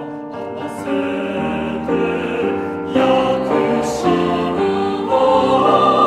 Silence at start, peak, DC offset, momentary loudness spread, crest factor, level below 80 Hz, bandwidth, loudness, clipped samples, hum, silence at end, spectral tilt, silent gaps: 0 s; -2 dBFS; under 0.1%; 10 LU; 16 dB; -48 dBFS; 13 kHz; -17 LUFS; under 0.1%; none; 0 s; -6 dB/octave; none